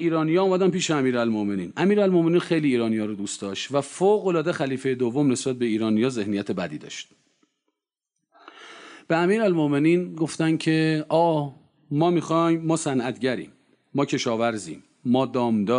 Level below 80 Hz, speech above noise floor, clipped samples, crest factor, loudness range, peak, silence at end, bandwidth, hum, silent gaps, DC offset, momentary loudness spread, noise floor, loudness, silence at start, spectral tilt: -70 dBFS; 61 dB; under 0.1%; 14 dB; 6 LU; -10 dBFS; 0 s; 10.5 kHz; none; none; under 0.1%; 10 LU; -83 dBFS; -23 LUFS; 0 s; -6 dB/octave